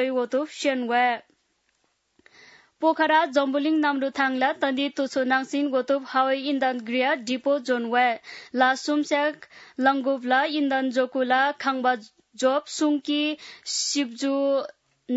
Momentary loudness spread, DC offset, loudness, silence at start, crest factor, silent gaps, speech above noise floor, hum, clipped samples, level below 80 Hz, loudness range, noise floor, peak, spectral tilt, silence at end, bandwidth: 4 LU; under 0.1%; -24 LUFS; 0 s; 18 dB; none; 47 dB; none; under 0.1%; -80 dBFS; 2 LU; -71 dBFS; -8 dBFS; -2 dB/octave; 0 s; 8 kHz